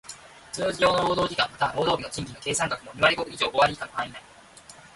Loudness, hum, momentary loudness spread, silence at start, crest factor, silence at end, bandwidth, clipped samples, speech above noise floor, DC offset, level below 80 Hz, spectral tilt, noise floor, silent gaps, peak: -25 LUFS; none; 13 LU; 0.05 s; 20 dB; 0.1 s; 11.5 kHz; under 0.1%; 24 dB; under 0.1%; -54 dBFS; -3 dB/octave; -49 dBFS; none; -6 dBFS